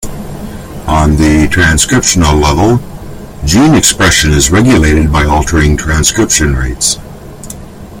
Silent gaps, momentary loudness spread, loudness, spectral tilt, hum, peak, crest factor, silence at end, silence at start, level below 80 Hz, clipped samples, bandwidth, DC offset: none; 19 LU; -8 LUFS; -4 dB/octave; none; 0 dBFS; 10 dB; 0 s; 0 s; -18 dBFS; 0.1%; over 20 kHz; under 0.1%